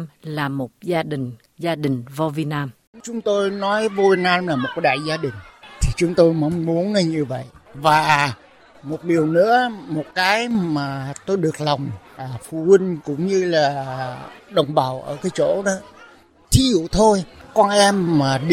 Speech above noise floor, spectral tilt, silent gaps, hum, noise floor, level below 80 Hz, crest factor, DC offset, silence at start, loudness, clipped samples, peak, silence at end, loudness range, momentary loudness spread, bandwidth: 29 dB; -5 dB/octave; 2.87-2.93 s; none; -48 dBFS; -38 dBFS; 18 dB; under 0.1%; 0 s; -20 LUFS; under 0.1%; -2 dBFS; 0 s; 3 LU; 14 LU; 16 kHz